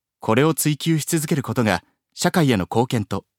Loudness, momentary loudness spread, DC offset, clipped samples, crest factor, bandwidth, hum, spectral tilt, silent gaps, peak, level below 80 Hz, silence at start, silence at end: -21 LUFS; 5 LU; under 0.1%; under 0.1%; 20 dB; 17.5 kHz; none; -5 dB/octave; none; -2 dBFS; -56 dBFS; 0.25 s; 0.2 s